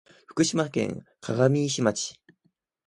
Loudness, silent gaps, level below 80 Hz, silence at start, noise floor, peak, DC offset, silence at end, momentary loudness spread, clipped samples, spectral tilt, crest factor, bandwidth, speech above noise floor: -26 LUFS; none; -64 dBFS; 0.3 s; -72 dBFS; -8 dBFS; under 0.1%; 0.75 s; 12 LU; under 0.1%; -5 dB/octave; 20 dB; 11.5 kHz; 47 dB